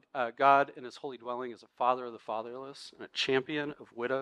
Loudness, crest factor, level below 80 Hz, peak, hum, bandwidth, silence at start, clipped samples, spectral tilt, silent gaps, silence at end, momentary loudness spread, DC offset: -31 LUFS; 22 dB; -78 dBFS; -10 dBFS; none; 11 kHz; 0.15 s; under 0.1%; -4.5 dB/octave; none; 0 s; 18 LU; under 0.1%